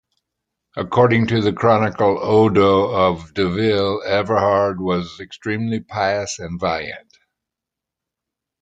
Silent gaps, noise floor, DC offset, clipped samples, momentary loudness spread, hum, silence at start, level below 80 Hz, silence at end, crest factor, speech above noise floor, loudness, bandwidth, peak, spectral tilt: none; -85 dBFS; under 0.1%; under 0.1%; 11 LU; none; 0.75 s; -54 dBFS; 1.65 s; 18 dB; 67 dB; -18 LUFS; 9.2 kHz; -2 dBFS; -6 dB/octave